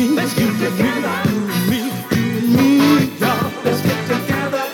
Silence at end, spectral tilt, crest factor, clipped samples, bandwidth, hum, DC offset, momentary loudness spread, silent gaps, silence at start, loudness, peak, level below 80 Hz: 0 s; -5.5 dB/octave; 14 dB; under 0.1%; 18 kHz; none; under 0.1%; 7 LU; none; 0 s; -17 LUFS; -2 dBFS; -50 dBFS